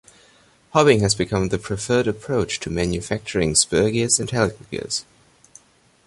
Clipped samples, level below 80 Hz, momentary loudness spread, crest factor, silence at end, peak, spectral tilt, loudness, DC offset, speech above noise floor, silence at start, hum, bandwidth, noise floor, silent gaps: under 0.1%; -42 dBFS; 10 LU; 20 dB; 1.05 s; -2 dBFS; -4 dB/octave; -20 LUFS; under 0.1%; 36 dB; 0.75 s; none; 11.5 kHz; -56 dBFS; none